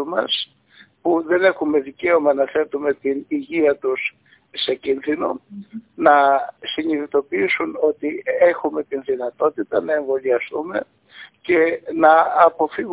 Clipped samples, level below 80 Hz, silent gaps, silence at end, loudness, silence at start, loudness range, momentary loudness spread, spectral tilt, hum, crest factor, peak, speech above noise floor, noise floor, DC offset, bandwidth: under 0.1%; -62 dBFS; none; 0 s; -19 LUFS; 0 s; 3 LU; 11 LU; -8 dB/octave; none; 18 dB; 0 dBFS; 32 dB; -51 dBFS; under 0.1%; 4 kHz